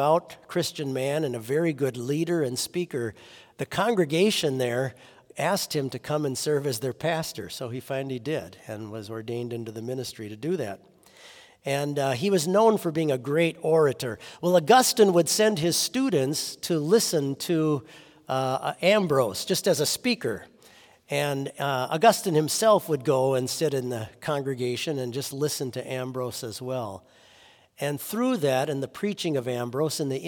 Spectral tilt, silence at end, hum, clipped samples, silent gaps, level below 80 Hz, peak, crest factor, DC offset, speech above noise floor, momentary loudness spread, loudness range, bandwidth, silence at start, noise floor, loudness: -4.5 dB/octave; 0 s; none; under 0.1%; none; -70 dBFS; -6 dBFS; 20 dB; under 0.1%; 30 dB; 13 LU; 10 LU; 18 kHz; 0 s; -56 dBFS; -26 LUFS